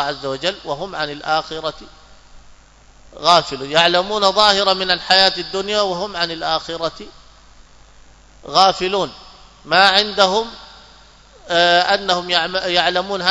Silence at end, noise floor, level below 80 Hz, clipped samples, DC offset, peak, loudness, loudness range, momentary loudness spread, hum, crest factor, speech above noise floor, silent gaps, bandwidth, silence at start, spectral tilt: 0 s; -47 dBFS; -48 dBFS; under 0.1%; under 0.1%; 0 dBFS; -16 LUFS; 6 LU; 13 LU; none; 18 dB; 30 dB; none; 11 kHz; 0 s; -2.5 dB/octave